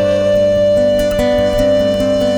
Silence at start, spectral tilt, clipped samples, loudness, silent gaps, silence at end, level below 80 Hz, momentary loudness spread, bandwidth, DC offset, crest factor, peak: 0 s; -6 dB/octave; under 0.1%; -13 LUFS; none; 0 s; -30 dBFS; 2 LU; 19 kHz; under 0.1%; 10 dB; -2 dBFS